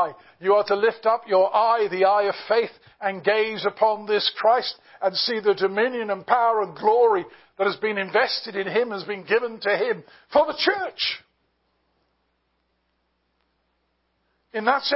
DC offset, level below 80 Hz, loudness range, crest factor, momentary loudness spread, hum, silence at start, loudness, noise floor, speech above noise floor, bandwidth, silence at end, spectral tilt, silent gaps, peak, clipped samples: under 0.1%; -70 dBFS; 6 LU; 20 dB; 8 LU; none; 0 s; -22 LUFS; -72 dBFS; 50 dB; 5.8 kHz; 0 s; -7 dB/octave; none; -4 dBFS; under 0.1%